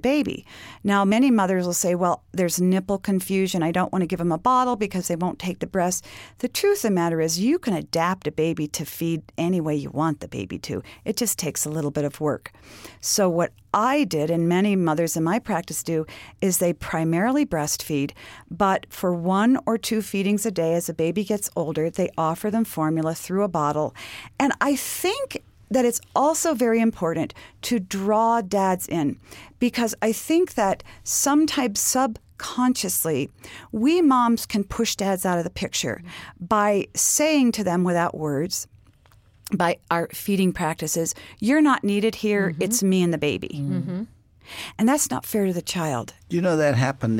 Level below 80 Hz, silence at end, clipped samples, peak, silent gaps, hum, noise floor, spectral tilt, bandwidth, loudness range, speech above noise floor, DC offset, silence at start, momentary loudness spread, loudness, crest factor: -54 dBFS; 0 s; under 0.1%; -6 dBFS; none; none; -55 dBFS; -4.5 dB/octave; 17 kHz; 3 LU; 32 dB; under 0.1%; 0.05 s; 10 LU; -23 LUFS; 16 dB